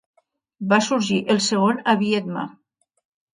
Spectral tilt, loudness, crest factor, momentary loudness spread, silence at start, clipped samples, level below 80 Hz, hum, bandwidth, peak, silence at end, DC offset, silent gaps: -4.5 dB/octave; -20 LUFS; 18 dB; 12 LU; 0.6 s; under 0.1%; -68 dBFS; none; 10.5 kHz; -4 dBFS; 0.8 s; under 0.1%; none